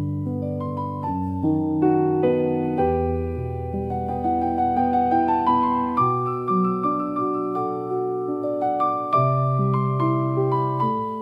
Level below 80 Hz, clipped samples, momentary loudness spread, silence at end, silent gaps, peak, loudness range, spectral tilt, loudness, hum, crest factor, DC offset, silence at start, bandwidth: -48 dBFS; under 0.1%; 7 LU; 0 s; none; -8 dBFS; 2 LU; -10.5 dB/octave; -23 LUFS; none; 14 dB; under 0.1%; 0 s; 5.2 kHz